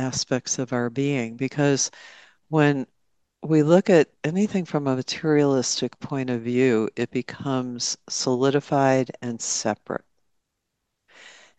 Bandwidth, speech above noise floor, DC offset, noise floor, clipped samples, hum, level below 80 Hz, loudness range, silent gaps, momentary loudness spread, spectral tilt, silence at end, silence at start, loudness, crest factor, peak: 9.2 kHz; 56 dB; under 0.1%; -79 dBFS; under 0.1%; none; -68 dBFS; 3 LU; none; 10 LU; -5 dB/octave; 0.3 s; 0 s; -23 LUFS; 20 dB; -4 dBFS